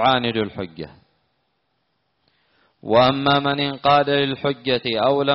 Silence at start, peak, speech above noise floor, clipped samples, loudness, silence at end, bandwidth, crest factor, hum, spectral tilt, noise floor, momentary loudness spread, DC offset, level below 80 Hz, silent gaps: 0 s; -4 dBFS; 52 dB; under 0.1%; -19 LUFS; 0 s; 5.8 kHz; 18 dB; none; -3 dB/octave; -71 dBFS; 16 LU; under 0.1%; -56 dBFS; none